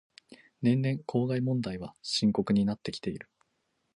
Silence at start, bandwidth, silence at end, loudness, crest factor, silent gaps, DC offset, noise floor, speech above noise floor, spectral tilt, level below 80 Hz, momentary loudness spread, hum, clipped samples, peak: 0.3 s; 11 kHz; 0.75 s; -30 LUFS; 16 dB; none; under 0.1%; -77 dBFS; 48 dB; -6.5 dB/octave; -62 dBFS; 10 LU; none; under 0.1%; -14 dBFS